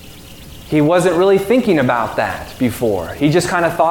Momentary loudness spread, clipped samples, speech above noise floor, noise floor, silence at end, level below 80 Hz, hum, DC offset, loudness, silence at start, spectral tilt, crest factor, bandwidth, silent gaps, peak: 8 LU; under 0.1%; 21 dB; -36 dBFS; 0 s; -42 dBFS; none; 0.2%; -15 LUFS; 0 s; -6 dB/octave; 14 dB; 18 kHz; none; -2 dBFS